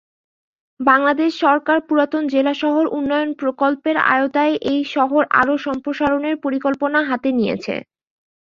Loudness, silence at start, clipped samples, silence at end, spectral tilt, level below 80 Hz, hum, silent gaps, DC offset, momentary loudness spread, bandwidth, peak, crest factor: -18 LUFS; 0.8 s; under 0.1%; 0.75 s; -6 dB/octave; -58 dBFS; none; none; under 0.1%; 6 LU; 7.2 kHz; -2 dBFS; 16 dB